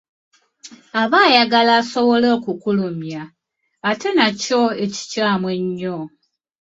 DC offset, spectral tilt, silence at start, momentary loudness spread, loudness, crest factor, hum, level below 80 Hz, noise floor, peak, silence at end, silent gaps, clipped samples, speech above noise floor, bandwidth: under 0.1%; -4.5 dB/octave; 0.65 s; 14 LU; -17 LUFS; 18 dB; none; -64 dBFS; -44 dBFS; 0 dBFS; 0.55 s; none; under 0.1%; 27 dB; 7.8 kHz